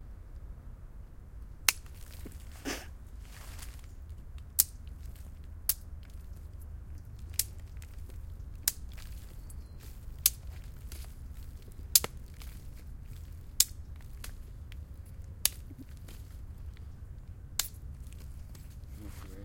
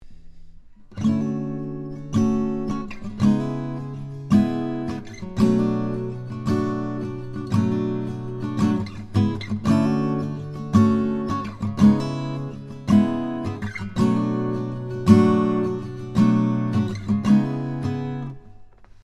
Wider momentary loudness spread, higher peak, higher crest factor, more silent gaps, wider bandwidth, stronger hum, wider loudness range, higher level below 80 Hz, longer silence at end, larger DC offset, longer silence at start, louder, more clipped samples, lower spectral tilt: first, 21 LU vs 13 LU; about the same, 0 dBFS vs 0 dBFS; first, 38 dB vs 22 dB; neither; first, 17 kHz vs 10.5 kHz; neither; first, 7 LU vs 4 LU; about the same, -46 dBFS vs -46 dBFS; about the same, 0 s vs 0.05 s; neither; about the same, 0 s vs 0.05 s; second, -31 LUFS vs -23 LUFS; neither; second, -1 dB/octave vs -8 dB/octave